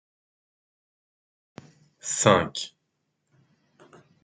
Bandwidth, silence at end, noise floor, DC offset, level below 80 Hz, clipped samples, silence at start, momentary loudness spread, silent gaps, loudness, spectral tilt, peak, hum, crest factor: 9.6 kHz; 1.55 s; -77 dBFS; under 0.1%; -66 dBFS; under 0.1%; 2.05 s; 18 LU; none; -23 LUFS; -3.5 dB/octave; -2 dBFS; none; 28 dB